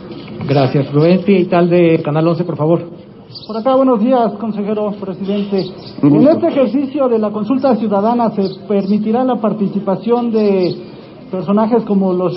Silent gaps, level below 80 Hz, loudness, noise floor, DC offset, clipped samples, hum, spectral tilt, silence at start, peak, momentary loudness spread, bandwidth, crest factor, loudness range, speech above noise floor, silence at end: none; -54 dBFS; -14 LUFS; -34 dBFS; under 0.1%; under 0.1%; none; -13 dB/octave; 0 s; 0 dBFS; 12 LU; 5.8 kHz; 12 dB; 2 LU; 21 dB; 0 s